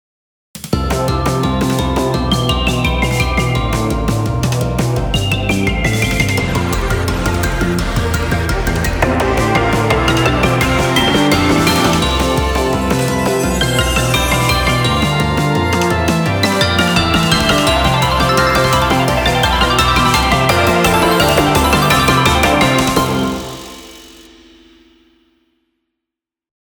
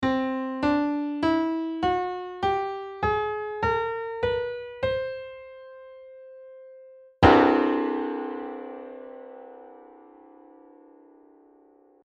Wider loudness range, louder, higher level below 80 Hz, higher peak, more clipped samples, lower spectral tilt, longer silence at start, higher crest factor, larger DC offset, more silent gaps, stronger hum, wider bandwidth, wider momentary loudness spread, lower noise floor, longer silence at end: second, 4 LU vs 12 LU; first, -13 LUFS vs -25 LUFS; first, -24 dBFS vs -48 dBFS; about the same, 0 dBFS vs -2 dBFS; neither; second, -4.5 dB/octave vs -7.5 dB/octave; first, 0.55 s vs 0 s; second, 14 dB vs 24 dB; neither; neither; neither; first, over 20 kHz vs 8 kHz; second, 6 LU vs 25 LU; first, -84 dBFS vs -58 dBFS; first, 2.65 s vs 2.1 s